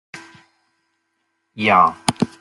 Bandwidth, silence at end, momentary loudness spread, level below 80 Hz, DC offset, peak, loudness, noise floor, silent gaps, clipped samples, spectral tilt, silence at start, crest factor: 13.5 kHz; 0.15 s; 25 LU; -58 dBFS; under 0.1%; 0 dBFS; -17 LUFS; -71 dBFS; none; under 0.1%; -4 dB/octave; 0.15 s; 22 dB